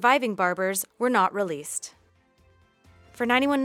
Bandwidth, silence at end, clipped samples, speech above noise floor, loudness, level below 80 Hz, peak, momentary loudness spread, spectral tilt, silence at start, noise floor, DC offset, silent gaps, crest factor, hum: 17 kHz; 0 s; under 0.1%; 37 dB; -25 LUFS; -66 dBFS; -6 dBFS; 11 LU; -3 dB/octave; 0 s; -61 dBFS; under 0.1%; none; 20 dB; none